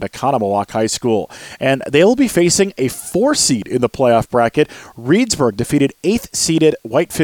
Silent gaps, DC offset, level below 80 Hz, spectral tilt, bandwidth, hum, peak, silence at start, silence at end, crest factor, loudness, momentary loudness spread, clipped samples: none; under 0.1%; -46 dBFS; -4.5 dB/octave; 19 kHz; none; -2 dBFS; 0 s; 0 s; 14 dB; -15 LUFS; 6 LU; under 0.1%